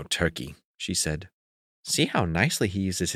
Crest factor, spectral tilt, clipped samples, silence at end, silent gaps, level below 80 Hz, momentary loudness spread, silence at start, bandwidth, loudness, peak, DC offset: 22 dB; -3.5 dB/octave; under 0.1%; 0 s; 0.65-0.74 s, 1.33-1.84 s; -48 dBFS; 14 LU; 0 s; 16 kHz; -26 LUFS; -6 dBFS; under 0.1%